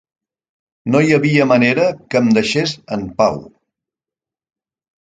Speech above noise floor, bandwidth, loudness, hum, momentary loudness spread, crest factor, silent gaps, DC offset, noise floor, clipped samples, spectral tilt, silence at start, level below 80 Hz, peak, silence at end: 74 dB; 9.2 kHz; -15 LUFS; none; 12 LU; 18 dB; none; under 0.1%; -89 dBFS; under 0.1%; -6 dB/octave; 0.85 s; -52 dBFS; 0 dBFS; 1.7 s